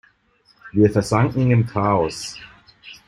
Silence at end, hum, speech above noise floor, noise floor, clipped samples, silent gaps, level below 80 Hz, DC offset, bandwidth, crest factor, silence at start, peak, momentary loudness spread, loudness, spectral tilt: 0.1 s; none; 41 dB; -59 dBFS; under 0.1%; none; -48 dBFS; under 0.1%; 12 kHz; 18 dB; 0.65 s; -2 dBFS; 14 LU; -19 LUFS; -7 dB/octave